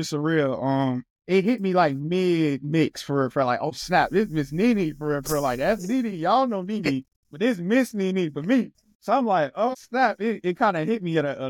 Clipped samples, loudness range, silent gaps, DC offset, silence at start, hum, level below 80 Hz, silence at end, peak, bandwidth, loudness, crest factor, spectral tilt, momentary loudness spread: under 0.1%; 1 LU; 1.10-1.16 s, 7.16-7.23 s, 8.95-9.00 s; under 0.1%; 0 s; none; -54 dBFS; 0 s; -8 dBFS; 17.5 kHz; -24 LUFS; 16 dB; -6 dB/octave; 5 LU